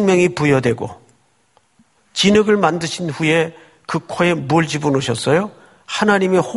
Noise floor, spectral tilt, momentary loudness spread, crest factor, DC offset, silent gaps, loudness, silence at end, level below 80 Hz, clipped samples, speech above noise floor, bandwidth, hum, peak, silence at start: -59 dBFS; -5 dB/octave; 12 LU; 18 dB; under 0.1%; none; -17 LUFS; 0 s; -52 dBFS; under 0.1%; 43 dB; 11.5 kHz; none; 0 dBFS; 0 s